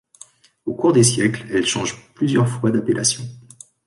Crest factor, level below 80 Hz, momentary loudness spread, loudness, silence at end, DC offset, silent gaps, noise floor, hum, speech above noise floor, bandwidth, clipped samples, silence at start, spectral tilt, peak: 16 dB; -56 dBFS; 14 LU; -19 LUFS; 0.45 s; under 0.1%; none; -48 dBFS; none; 29 dB; 11.5 kHz; under 0.1%; 0.65 s; -4.5 dB/octave; -4 dBFS